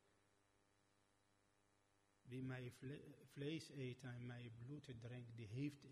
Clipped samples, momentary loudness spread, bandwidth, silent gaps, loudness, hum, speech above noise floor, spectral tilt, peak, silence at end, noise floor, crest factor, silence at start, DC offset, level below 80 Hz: under 0.1%; 7 LU; 13 kHz; none; -54 LUFS; none; 29 dB; -6.5 dB/octave; -38 dBFS; 0 s; -82 dBFS; 18 dB; 2.25 s; under 0.1%; -82 dBFS